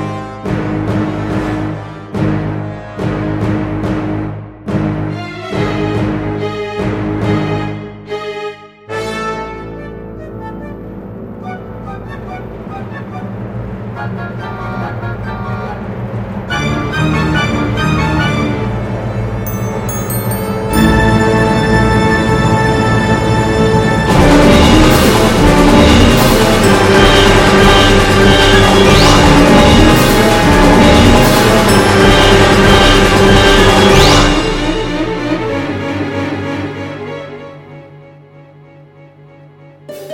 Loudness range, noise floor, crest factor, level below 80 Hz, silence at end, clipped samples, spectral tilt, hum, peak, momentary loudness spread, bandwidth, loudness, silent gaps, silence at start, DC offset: 17 LU; -39 dBFS; 12 dB; -20 dBFS; 0 s; 1%; -5 dB/octave; none; 0 dBFS; 19 LU; 17.5 kHz; -10 LUFS; none; 0 s; under 0.1%